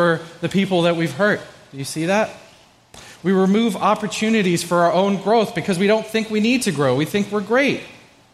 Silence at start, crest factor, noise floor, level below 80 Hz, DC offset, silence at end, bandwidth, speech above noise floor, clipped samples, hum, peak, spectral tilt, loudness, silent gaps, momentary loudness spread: 0 s; 16 dB; -50 dBFS; -58 dBFS; under 0.1%; 0.4 s; 15 kHz; 31 dB; under 0.1%; none; -4 dBFS; -5.5 dB/octave; -19 LUFS; none; 7 LU